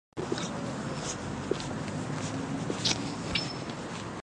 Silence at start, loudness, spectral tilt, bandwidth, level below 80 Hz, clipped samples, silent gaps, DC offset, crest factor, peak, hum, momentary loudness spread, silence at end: 0.15 s; -33 LUFS; -4 dB/octave; 11.5 kHz; -54 dBFS; under 0.1%; none; under 0.1%; 24 dB; -10 dBFS; none; 7 LU; 0 s